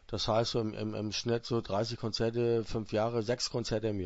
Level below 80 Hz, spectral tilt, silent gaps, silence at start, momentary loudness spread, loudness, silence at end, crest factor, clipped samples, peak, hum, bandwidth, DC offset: -52 dBFS; -5.5 dB/octave; none; 0.1 s; 4 LU; -33 LUFS; 0 s; 16 dB; under 0.1%; -18 dBFS; none; 8 kHz; under 0.1%